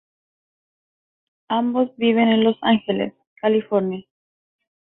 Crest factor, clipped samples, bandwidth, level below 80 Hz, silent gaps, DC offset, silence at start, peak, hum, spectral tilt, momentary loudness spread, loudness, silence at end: 18 dB; under 0.1%; 4 kHz; -66 dBFS; 3.27-3.36 s; under 0.1%; 1.5 s; -6 dBFS; none; -10.5 dB/octave; 9 LU; -20 LUFS; 0.85 s